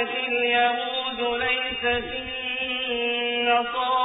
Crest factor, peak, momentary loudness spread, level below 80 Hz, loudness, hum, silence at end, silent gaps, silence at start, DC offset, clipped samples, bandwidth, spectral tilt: 16 dB; -10 dBFS; 6 LU; -52 dBFS; -24 LUFS; none; 0 s; none; 0 s; under 0.1%; under 0.1%; 4 kHz; -7 dB/octave